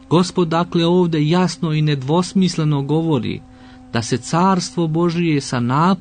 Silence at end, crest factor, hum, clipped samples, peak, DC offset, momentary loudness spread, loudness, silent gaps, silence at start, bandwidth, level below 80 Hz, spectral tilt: 0 s; 12 dB; none; under 0.1%; -4 dBFS; under 0.1%; 5 LU; -18 LUFS; none; 0.1 s; 9.6 kHz; -50 dBFS; -6 dB/octave